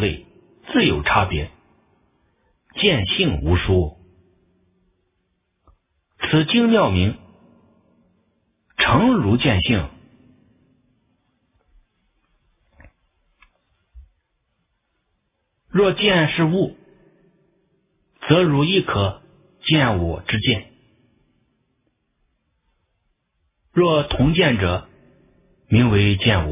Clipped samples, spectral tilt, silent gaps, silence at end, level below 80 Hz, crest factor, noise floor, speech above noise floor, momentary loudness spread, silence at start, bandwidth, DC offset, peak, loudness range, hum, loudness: under 0.1%; -10.5 dB/octave; none; 0 s; -36 dBFS; 20 dB; -72 dBFS; 55 dB; 12 LU; 0 s; 3.9 kHz; under 0.1%; -2 dBFS; 6 LU; none; -18 LUFS